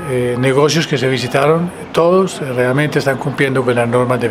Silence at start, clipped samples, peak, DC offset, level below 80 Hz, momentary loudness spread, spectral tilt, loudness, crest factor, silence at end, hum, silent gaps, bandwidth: 0 s; under 0.1%; 0 dBFS; under 0.1%; -48 dBFS; 5 LU; -5.5 dB/octave; -14 LUFS; 14 dB; 0 s; none; none; 15.5 kHz